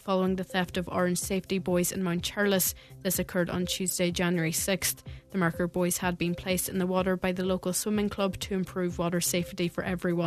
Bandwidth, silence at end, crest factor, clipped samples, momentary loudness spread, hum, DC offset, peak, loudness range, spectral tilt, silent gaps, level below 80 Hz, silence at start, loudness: 14 kHz; 0 s; 18 dB; under 0.1%; 4 LU; none; under 0.1%; -10 dBFS; 1 LU; -4.5 dB/octave; none; -52 dBFS; 0.05 s; -29 LUFS